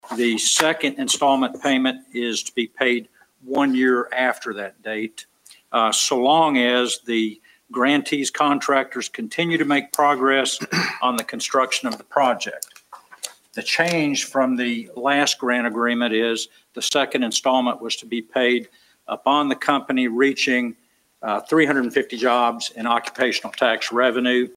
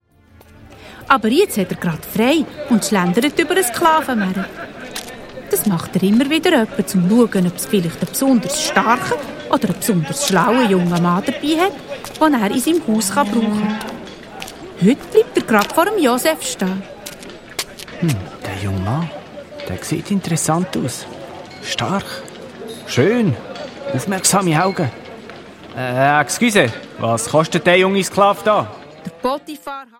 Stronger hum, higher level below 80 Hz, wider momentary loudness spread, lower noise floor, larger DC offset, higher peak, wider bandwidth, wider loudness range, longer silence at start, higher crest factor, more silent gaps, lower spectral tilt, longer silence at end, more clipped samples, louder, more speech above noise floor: neither; second, -72 dBFS vs -52 dBFS; second, 10 LU vs 17 LU; about the same, -45 dBFS vs -48 dBFS; neither; about the same, 0 dBFS vs 0 dBFS; about the same, 16 kHz vs 16.5 kHz; second, 3 LU vs 6 LU; second, 0.05 s vs 0.6 s; about the same, 20 dB vs 18 dB; neither; second, -2.5 dB/octave vs -4.5 dB/octave; about the same, 0.05 s vs 0.15 s; neither; second, -20 LUFS vs -17 LUFS; second, 25 dB vs 31 dB